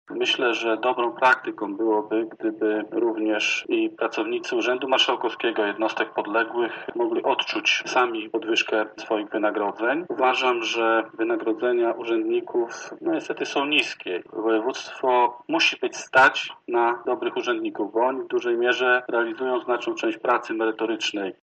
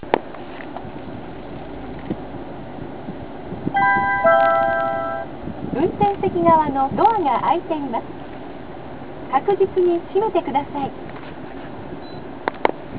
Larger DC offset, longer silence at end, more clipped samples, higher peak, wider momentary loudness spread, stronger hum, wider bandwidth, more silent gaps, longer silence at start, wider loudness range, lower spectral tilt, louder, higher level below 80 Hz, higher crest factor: second, under 0.1% vs 1%; first, 0.15 s vs 0 s; neither; second, -6 dBFS vs 0 dBFS; second, 7 LU vs 18 LU; neither; first, 8.4 kHz vs 4 kHz; neither; about the same, 0.1 s vs 0.05 s; second, 3 LU vs 7 LU; second, -2.5 dB/octave vs -10 dB/octave; second, -23 LUFS vs -20 LUFS; second, -76 dBFS vs -46 dBFS; about the same, 18 dB vs 22 dB